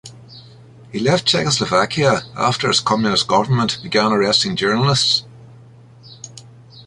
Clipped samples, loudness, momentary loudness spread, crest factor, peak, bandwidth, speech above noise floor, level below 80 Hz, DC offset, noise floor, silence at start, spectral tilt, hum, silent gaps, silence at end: under 0.1%; -16 LUFS; 15 LU; 16 dB; -2 dBFS; 11.5 kHz; 27 dB; -52 dBFS; under 0.1%; -43 dBFS; 0.05 s; -4 dB/octave; none; none; 0.05 s